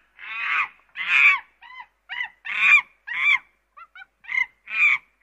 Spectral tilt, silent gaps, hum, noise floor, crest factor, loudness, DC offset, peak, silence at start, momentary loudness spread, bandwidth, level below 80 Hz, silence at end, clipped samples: 1.5 dB/octave; none; none; -50 dBFS; 18 dB; -20 LUFS; under 0.1%; -6 dBFS; 0.2 s; 16 LU; 13 kHz; -72 dBFS; 0.25 s; under 0.1%